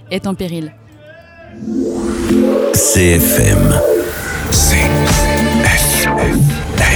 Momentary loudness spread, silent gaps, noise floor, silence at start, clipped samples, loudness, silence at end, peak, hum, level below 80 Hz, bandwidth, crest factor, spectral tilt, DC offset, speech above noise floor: 11 LU; none; -38 dBFS; 0.1 s; under 0.1%; -12 LUFS; 0 s; 0 dBFS; none; -22 dBFS; over 20 kHz; 12 dB; -4.5 dB/octave; under 0.1%; 27 dB